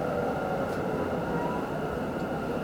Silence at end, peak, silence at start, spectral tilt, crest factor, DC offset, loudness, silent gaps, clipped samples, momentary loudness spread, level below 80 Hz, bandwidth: 0 s; -18 dBFS; 0 s; -7 dB/octave; 14 dB; under 0.1%; -31 LUFS; none; under 0.1%; 2 LU; -50 dBFS; over 20 kHz